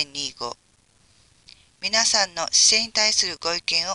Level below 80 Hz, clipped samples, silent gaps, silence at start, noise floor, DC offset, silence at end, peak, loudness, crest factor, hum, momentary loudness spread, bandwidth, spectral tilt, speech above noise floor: -60 dBFS; under 0.1%; none; 0 s; -61 dBFS; under 0.1%; 0 s; -4 dBFS; -19 LUFS; 20 dB; none; 14 LU; 11.5 kHz; 1 dB/octave; 39 dB